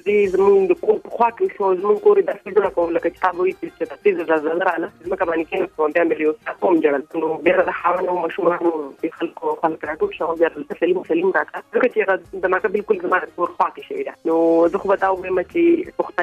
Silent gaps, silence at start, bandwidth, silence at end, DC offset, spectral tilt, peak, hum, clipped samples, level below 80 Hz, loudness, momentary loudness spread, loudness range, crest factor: none; 0.05 s; 7.8 kHz; 0 s; under 0.1%; -7 dB/octave; -2 dBFS; none; under 0.1%; -56 dBFS; -20 LUFS; 8 LU; 2 LU; 18 dB